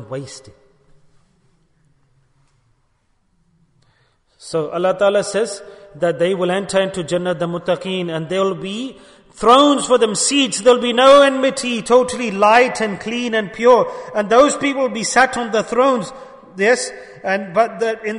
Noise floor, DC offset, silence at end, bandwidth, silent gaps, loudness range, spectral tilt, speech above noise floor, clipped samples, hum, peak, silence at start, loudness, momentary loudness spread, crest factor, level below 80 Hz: -62 dBFS; under 0.1%; 0 s; 11 kHz; none; 9 LU; -3.5 dB/octave; 46 dB; under 0.1%; none; 0 dBFS; 0 s; -16 LUFS; 12 LU; 16 dB; -54 dBFS